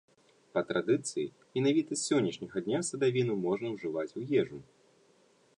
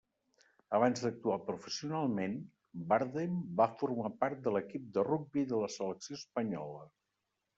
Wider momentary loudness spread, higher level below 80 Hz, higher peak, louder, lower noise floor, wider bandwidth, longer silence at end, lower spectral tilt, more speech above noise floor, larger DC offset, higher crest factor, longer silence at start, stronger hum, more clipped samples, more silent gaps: about the same, 8 LU vs 10 LU; about the same, -74 dBFS vs -78 dBFS; about the same, -16 dBFS vs -14 dBFS; first, -32 LUFS vs -36 LUFS; second, -66 dBFS vs -86 dBFS; first, 11 kHz vs 8 kHz; first, 0.95 s vs 0.7 s; about the same, -5 dB/octave vs -5.5 dB/octave; second, 35 dB vs 51 dB; neither; second, 16 dB vs 22 dB; second, 0.55 s vs 0.7 s; neither; neither; neither